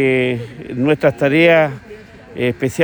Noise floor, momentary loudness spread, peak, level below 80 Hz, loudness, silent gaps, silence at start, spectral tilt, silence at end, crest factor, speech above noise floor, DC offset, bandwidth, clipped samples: -37 dBFS; 16 LU; -2 dBFS; -50 dBFS; -15 LUFS; none; 0 s; -6.5 dB/octave; 0 s; 14 dB; 22 dB; under 0.1%; over 20 kHz; under 0.1%